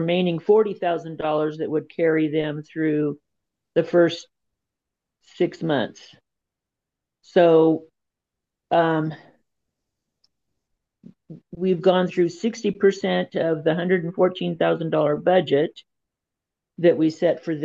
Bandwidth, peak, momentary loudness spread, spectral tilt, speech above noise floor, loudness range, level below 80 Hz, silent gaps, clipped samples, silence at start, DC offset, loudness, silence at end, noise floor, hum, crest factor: 7.6 kHz; -6 dBFS; 8 LU; -7 dB/octave; 64 dB; 6 LU; -70 dBFS; none; under 0.1%; 0 s; under 0.1%; -22 LUFS; 0 s; -85 dBFS; none; 18 dB